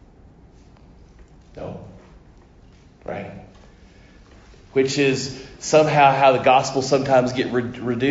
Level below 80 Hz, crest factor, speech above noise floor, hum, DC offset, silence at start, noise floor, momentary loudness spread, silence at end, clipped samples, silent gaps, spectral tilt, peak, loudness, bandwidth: -50 dBFS; 20 dB; 30 dB; none; under 0.1%; 1.55 s; -49 dBFS; 21 LU; 0 s; under 0.1%; none; -5 dB/octave; -2 dBFS; -18 LUFS; 8 kHz